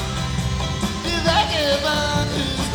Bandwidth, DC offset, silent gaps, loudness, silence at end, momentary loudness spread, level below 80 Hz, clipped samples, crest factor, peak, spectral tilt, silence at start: over 20 kHz; under 0.1%; none; -21 LUFS; 0 s; 6 LU; -32 dBFS; under 0.1%; 16 dB; -6 dBFS; -4 dB/octave; 0 s